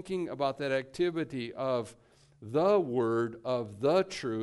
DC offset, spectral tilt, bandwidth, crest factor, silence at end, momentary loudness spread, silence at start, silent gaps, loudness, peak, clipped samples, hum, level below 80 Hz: under 0.1%; -6 dB/octave; 11.5 kHz; 16 dB; 0 s; 9 LU; 0 s; none; -31 LUFS; -14 dBFS; under 0.1%; none; -68 dBFS